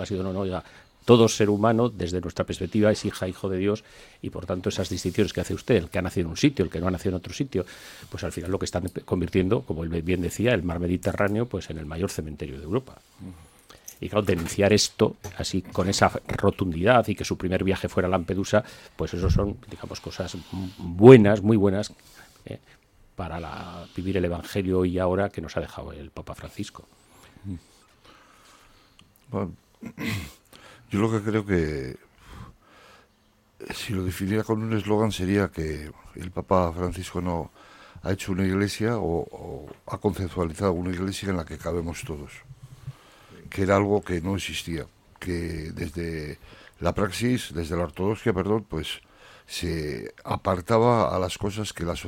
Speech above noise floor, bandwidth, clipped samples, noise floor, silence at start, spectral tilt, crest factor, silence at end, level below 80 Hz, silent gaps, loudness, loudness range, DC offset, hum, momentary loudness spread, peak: 37 dB; 16.5 kHz; under 0.1%; -62 dBFS; 0 s; -6 dB/octave; 26 dB; 0 s; -44 dBFS; none; -25 LUFS; 11 LU; under 0.1%; none; 18 LU; 0 dBFS